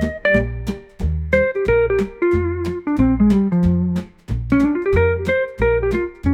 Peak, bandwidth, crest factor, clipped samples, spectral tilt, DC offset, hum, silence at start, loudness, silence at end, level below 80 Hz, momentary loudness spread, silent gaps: -2 dBFS; 11 kHz; 14 dB; under 0.1%; -8.5 dB/octave; under 0.1%; none; 0 s; -18 LUFS; 0 s; -30 dBFS; 10 LU; none